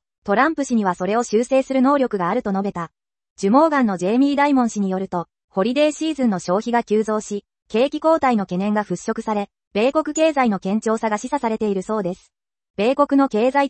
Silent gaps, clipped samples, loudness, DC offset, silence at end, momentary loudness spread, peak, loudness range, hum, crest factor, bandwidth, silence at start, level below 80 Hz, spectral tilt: 3.30-3.36 s, 5.44-5.48 s, 9.67-9.71 s, 12.70-12.74 s; under 0.1%; -20 LUFS; under 0.1%; 0 s; 9 LU; -4 dBFS; 2 LU; none; 16 dB; 8.8 kHz; 0.25 s; -60 dBFS; -5.5 dB/octave